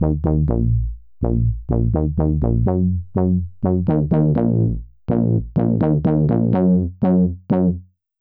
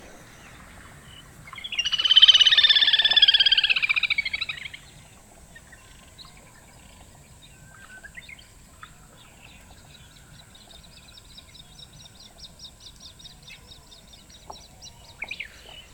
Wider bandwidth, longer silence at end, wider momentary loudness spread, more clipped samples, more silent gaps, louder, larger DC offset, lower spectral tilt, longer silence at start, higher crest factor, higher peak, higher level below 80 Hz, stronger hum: second, 3.3 kHz vs 19 kHz; first, 0.35 s vs 0.15 s; second, 5 LU vs 30 LU; neither; neither; second, -19 LUFS vs -16 LUFS; neither; first, -14.5 dB/octave vs 0.5 dB/octave; second, 0 s vs 1.45 s; second, 10 dB vs 24 dB; second, -6 dBFS vs -2 dBFS; first, -28 dBFS vs -56 dBFS; neither